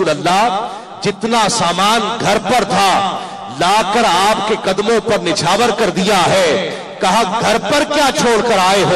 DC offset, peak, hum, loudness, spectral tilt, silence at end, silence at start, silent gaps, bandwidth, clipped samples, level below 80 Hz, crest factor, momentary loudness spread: 0.5%; -4 dBFS; none; -13 LUFS; -3.5 dB/octave; 0 s; 0 s; none; 13.5 kHz; under 0.1%; -46 dBFS; 10 dB; 7 LU